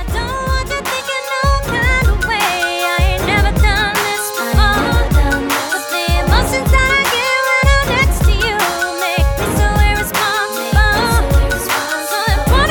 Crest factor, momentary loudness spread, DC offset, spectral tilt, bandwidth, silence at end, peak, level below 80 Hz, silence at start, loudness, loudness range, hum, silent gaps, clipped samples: 14 dB; 5 LU; under 0.1%; -4 dB/octave; 19.5 kHz; 0 s; 0 dBFS; -18 dBFS; 0 s; -14 LUFS; 1 LU; none; none; under 0.1%